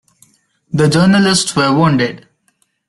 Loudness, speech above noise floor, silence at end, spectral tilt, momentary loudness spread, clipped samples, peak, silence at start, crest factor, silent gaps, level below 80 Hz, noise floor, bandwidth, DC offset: -12 LUFS; 50 dB; 0.7 s; -5 dB/octave; 8 LU; under 0.1%; 0 dBFS; 0.75 s; 14 dB; none; -48 dBFS; -61 dBFS; 12 kHz; under 0.1%